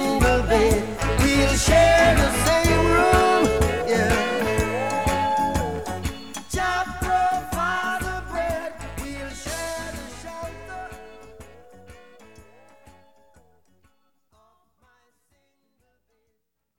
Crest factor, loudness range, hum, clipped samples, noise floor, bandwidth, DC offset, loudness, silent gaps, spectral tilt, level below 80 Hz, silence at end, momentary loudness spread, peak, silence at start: 20 dB; 18 LU; none; under 0.1%; -76 dBFS; over 20 kHz; 0.6%; -21 LUFS; none; -4.5 dB/octave; -32 dBFS; 3.9 s; 18 LU; -4 dBFS; 0 s